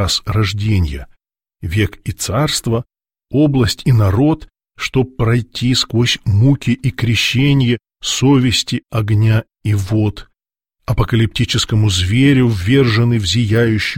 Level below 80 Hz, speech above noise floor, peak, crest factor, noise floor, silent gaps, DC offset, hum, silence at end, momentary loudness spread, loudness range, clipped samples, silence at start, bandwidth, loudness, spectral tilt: -34 dBFS; 62 dB; -2 dBFS; 14 dB; -76 dBFS; none; 0.3%; none; 0 s; 8 LU; 3 LU; under 0.1%; 0 s; 16.5 kHz; -15 LUFS; -5.5 dB/octave